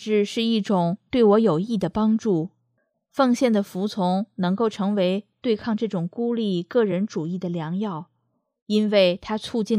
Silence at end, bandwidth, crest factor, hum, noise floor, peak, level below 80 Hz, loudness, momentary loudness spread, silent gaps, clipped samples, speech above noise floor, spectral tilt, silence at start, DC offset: 0 s; 13.5 kHz; 16 dB; none; -73 dBFS; -6 dBFS; -60 dBFS; -23 LUFS; 9 LU; 8.62-8.66 s; under 0.1%; 51 dB; -6.5 dB/octave; 0 s; under 0.1%